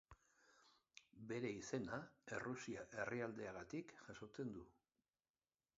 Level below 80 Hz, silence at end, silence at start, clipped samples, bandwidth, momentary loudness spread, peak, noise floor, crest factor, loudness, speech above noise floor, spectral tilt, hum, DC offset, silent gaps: -78 dBFS; 1.05 s; 0.1 s; under 0.1%; 7.6 kHz; 14 LU; -30 dBFS; under -90 dBFS; 22 dB; -50 LUFS; over 40 dB; -5 dB/octave; none; under 0.1%; none